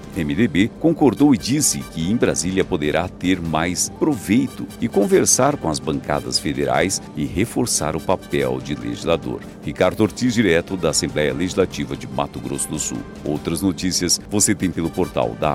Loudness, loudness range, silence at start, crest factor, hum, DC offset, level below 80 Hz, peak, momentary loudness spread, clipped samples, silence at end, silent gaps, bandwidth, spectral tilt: -20 LUFS; 3 LU; 0 s; 18 dB; none; under 0.1%; -42 dBFS; -2 dBFS; 9 LU; under 0.1%; 0 s; none; 16 kHz; -4 dB/octave